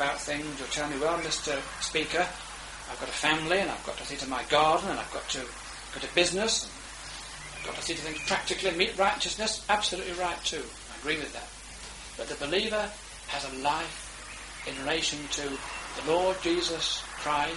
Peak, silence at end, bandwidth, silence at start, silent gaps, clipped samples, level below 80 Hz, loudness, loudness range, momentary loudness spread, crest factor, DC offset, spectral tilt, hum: -8 dBFS; 0 s; 11.5 kHz; 0 s; none; under 0.1%; -52 dBFS; -30 LUFS; 4 LU; 14 LU; 24 dB; under 0.1%; -2 dB/octave; none